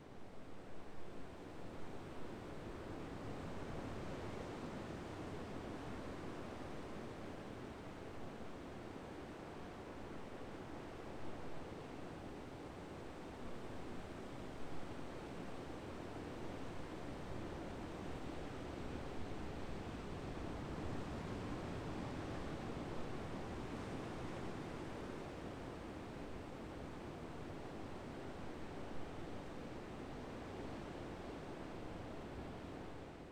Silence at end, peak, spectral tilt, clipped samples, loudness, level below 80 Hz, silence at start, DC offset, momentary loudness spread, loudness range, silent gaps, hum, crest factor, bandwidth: 0 s; -32 dBFS; -6.5 dB/octave; under 0.1%; -49 LUFS; -60 dBFS; 0 s; under 0.1%; 5 LU; 5 LU; none; none; 14 dB; 18 kHz